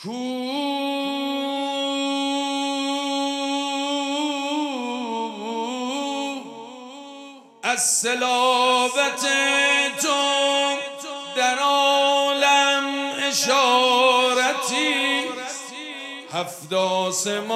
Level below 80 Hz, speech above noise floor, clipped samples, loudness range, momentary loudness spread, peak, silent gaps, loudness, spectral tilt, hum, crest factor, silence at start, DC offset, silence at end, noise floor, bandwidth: -82 dBFS; 22 dB; under 0.1%; 7 LU; 13 LU; -6 dBFS; none; -21 LUFS; -1 dB/octave; none; 16 dB; 0 s; under 0.1%; 0 s; -43 dBFS; 15.5 kHz